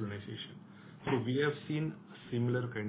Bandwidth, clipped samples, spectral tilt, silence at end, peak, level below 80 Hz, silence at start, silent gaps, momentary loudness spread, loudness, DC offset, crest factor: 4 kHz; under 0.1%; -6 dB/octave; 0 s; -20 dBFS; -68 dBFS; 0 s; none; 16 LU; -36 LUFS; under 0.1%; 16 dB